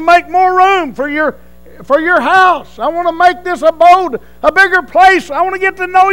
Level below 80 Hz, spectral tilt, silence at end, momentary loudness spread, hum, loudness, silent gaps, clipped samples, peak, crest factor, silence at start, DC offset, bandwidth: -42 dBFS; -3.5 dB/octave; 0 s; 8 LU; 60 Hz at -45 dBFS; -10 LUFS; none; 1%; 0 dBFS; 10 dB; 0 s; 1%; 16.5 kHz